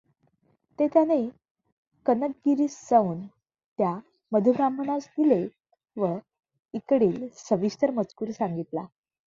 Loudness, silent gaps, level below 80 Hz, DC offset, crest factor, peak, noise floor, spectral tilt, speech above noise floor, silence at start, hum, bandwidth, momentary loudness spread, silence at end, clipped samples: -26 LUFS; 1.51-1.55 s, 1.72-1.91 s, 3.66-3.76 s; -70 dBFS; under 0.1%; 20 dB; -8 dBFS; -68 dBFS; -7.5 dB/octave; 44 dB; 0.8 s; none; 7.6 kHz; 15 LU; 0.4 s; under 0.1%